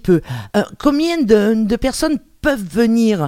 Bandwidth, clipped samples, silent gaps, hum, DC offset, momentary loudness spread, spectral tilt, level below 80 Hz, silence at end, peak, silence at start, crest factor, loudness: 16 kHz; under 0.1%; none; none; under 0.1%; 7 LU; -6 dB/octave; -36 dBFS; 0 s; 0 dBFS; 0.05 s; 14 dB; -16 LUFS